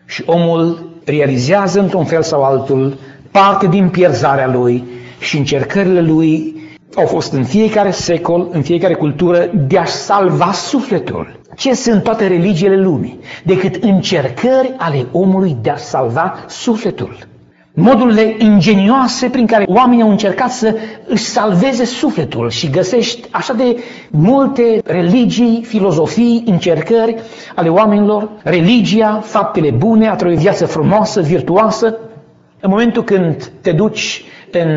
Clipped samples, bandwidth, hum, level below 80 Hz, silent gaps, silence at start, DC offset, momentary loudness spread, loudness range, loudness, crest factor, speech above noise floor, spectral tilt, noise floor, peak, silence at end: under 0.1%; 8 kHz; none; -46 dBFS; none; 0.1 s; under 0.1%; 9 LU; 3 LU; -12 LUFS; 12 dB; 29 dB; -5.5 dB/octave; -41 dBFS; 0 dBFS; 0 s